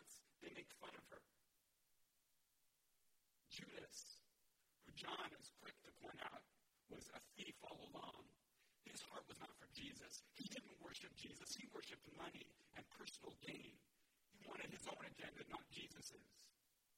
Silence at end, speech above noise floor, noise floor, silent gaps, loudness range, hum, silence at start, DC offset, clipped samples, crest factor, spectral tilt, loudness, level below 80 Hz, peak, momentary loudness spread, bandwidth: 0 s; 26 dB; -84 dBFS; none; 7 LU; none; 0 s; under 0.1%; under 0.1%; 22 dB; -2.5 dB/octave; -57 LUFS; -84 dBFS; -36 dBFS; 10 LU; 16.5 kHz